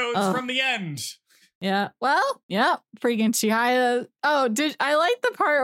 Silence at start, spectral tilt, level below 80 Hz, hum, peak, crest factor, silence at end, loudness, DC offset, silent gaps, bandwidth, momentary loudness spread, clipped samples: 0 s; -3.5 dB/octave; -82 dBFS; none; -8 dBFS; 16 dB; 0 s; -23 LUFS; under 0.1%; 1.55-1.61 s, 2.43-2.49 s; 16.5 kHz; 6 LU; under 0.1%